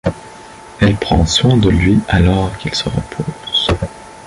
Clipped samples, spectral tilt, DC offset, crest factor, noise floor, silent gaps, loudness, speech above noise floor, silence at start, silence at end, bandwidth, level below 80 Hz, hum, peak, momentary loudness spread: under 0.1%; -5.5 dB/octave; under 0.1%; 14 dB; -35 dBFS; none; -14 LUFS; 22 dB; 0.05 s; 0 s; 11.5 kHz; -26 dBFS; none; -2 dBFS; 12 LU